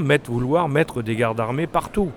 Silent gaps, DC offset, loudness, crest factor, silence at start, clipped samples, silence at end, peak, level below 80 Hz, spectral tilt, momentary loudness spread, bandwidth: none; under 0.1%; -22 LUFS; 16 dB; 0 s; under 0.1%; 0 s; -6 dBFS; -42 dBFS; -6.5 dB/octave; 4 LU; 17.5 kHz